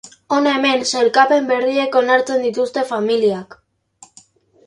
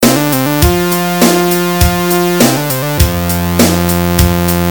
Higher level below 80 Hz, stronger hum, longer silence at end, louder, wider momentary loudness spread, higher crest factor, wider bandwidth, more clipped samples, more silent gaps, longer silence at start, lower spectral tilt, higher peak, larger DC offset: second, -66 dBFS vs -22 dBFS; neither; first, 1.25 s vs 0 s; second, -16 LUFS vs -11 LUFS; first, 6 LU vs 3 LU; first, 18 dB vs 10 dB; second, 11.5 kHz vs over 20 kHz; second, under 0.1% vs 0.4%; neither; about the same, 0.05 s vs 0 s; second, -3 dB/octave vs -4.5 dB/octave; about the same, 0 dBFS vs 0 dBFS; second, under 0.1% vs 1%